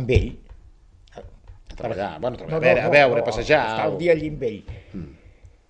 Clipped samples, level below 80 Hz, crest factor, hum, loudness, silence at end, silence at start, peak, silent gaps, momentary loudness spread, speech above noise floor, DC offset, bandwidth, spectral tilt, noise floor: under 0.1%; -38 dBFS; 22 dB; none; -21 LUFS; 0.55 s; 0 s; 0 dBFS; none; 22 LU; 29 dB; under 0.1%; 9.8 kHz; -6.5 dB/octave; -50 dBFS